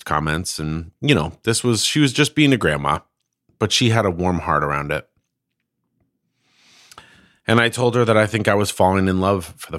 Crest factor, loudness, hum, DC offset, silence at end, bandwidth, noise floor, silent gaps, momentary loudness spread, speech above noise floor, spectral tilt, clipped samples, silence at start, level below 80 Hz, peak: 20 dB; -18 LUFS; none; under 0.1%; 0 s; 16 kHz; -77 dBFS; none; 9 LU; 59 dB; -4.5 dB/octave; under 0.1%; 0.05 s; -44 dBFS; 0 dBFS